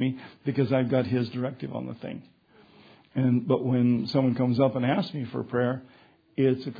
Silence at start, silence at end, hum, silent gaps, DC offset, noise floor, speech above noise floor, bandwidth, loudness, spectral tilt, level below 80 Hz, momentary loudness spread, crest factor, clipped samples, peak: 0 s; 0 s; none; none; under 0.1%; -56 dBFS; 30 dB; 5 kHz; -27 LUFS; -9.5 dB/octave; -66 dBFS; 12 LU; 18 dB; under 0.1%; -8 dBFS